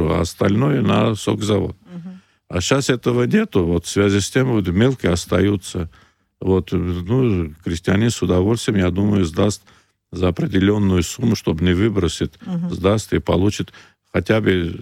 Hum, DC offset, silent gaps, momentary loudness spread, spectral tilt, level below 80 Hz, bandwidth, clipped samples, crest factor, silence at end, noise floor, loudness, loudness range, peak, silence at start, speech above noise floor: none; under 0.1%; none; 9 LU; -6 dB/octave; -40 dBFS; 16 kHz; under 0.1%; 16 dB; 0 s; -38 dBFS; -19 LUFS; 2 LU; -4 dBFS; 0 s; 20 dB